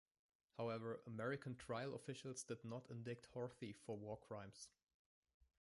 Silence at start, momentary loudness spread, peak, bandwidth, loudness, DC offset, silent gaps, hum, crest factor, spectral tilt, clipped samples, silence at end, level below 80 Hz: 0.55 s; 8 LU; -34 dBFS; 11.5 kHz; -51 LUFS; under 0.1%; 4.83-4.87 s, 4.94-5.23 s, 5.34-5.40 s; none; 18 dB; -5.5 dB/octave; under 0.1%; 0.15 s; -80 dBFS